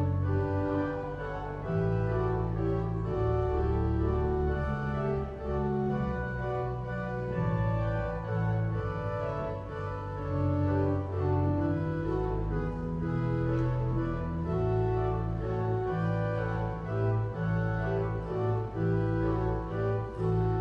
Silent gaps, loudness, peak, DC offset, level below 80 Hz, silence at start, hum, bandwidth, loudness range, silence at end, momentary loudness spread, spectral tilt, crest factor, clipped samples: none; -31 LUFS; -16 dBFS; under 0.1%; -40 dBFS; 0 s; none; 5.8 kHz; 2 LU; 0 s; 5 LU; -10 dB/octave; 14 dB; under 0.1%